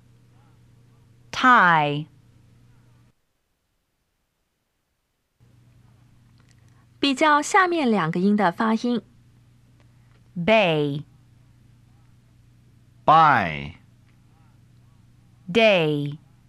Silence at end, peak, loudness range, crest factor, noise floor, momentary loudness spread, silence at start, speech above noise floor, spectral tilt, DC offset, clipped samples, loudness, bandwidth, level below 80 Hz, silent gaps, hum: 0.3 s; -4 dBFS; 5 LU; 20 dB; -74 dBFS; 17 LU; 1.35 s; 55 dB; -5 dB/octave; under 0.1%; under 0.1%; -20 LUFS; 12.5 kHz; -60 dBFS; none; none